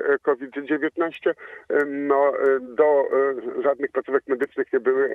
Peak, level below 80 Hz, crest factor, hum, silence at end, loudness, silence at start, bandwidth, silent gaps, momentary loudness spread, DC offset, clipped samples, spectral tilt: -6 dBFS; -74 dBFS; 16 dB; none; 0 s; -23 LUFS; 0 s; 3.9 kHz; none; 7 LU; under 0.1%; under 0.1%; -7 dB/octave